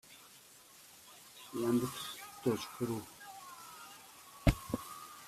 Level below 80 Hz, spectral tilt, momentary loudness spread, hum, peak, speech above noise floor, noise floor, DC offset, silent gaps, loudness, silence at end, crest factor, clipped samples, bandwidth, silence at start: -48 dBFS; -5.5 dB/octave; 21 LU; none; -12 dBFS; 24 dB; -59 dBFS; under 0.1%; none; -37 LUFS; 0 s; 28 dB; under 0.1%; 16 kHz; 0.05 s